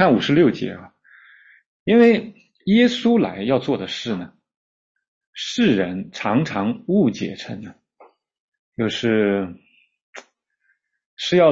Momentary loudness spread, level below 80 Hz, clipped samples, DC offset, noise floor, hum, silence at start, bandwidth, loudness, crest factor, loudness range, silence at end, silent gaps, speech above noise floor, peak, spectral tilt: 17 LU; -60 dBFS; under 0.1%; under 0.1%; -68 dBFS; none; 0 s; 7.6 kHz; -20 LUFS; 18 dB; 7 LU; 0 s; 1.66-1.86 s, 4.57-4.95 s, 5.08-5.21 s, 5.27-5.33 s, 8.40-8.52 s, 8.59-8.72 s, 10.03-10.13 s, 11.06-11.17 s; 50 dB; -2 dBFS; -6 dB/octave